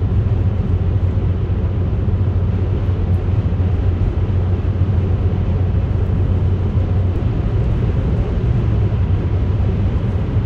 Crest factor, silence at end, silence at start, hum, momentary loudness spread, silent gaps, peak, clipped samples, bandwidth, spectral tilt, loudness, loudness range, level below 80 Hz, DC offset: 12 dB; 0 s; 0 s; none; 2 LU; none; -4 dBFS; under 0.1%; 4.4 kHz; -10 dB/octave; -18 LUFS; 0 LU; -22 dBFS; under 0.1%